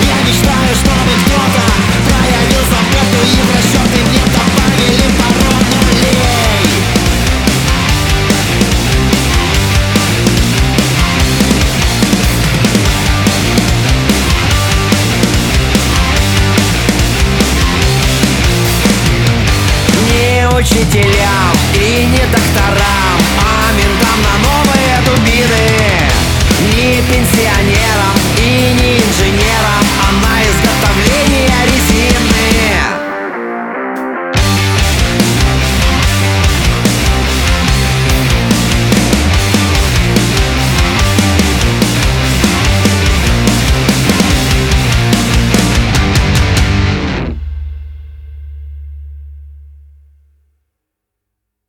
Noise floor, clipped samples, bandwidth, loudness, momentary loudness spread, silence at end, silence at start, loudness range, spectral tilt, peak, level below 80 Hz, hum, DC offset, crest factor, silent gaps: -75 dBFS; under 0.1%; 20 kHz; -10 LUFS; 2 LU; 2 s; 0 s; 2 LU; -4.5 dB/octave; 0 dBFS; -16 dBFS; none; under 0.1%; 10 dB; none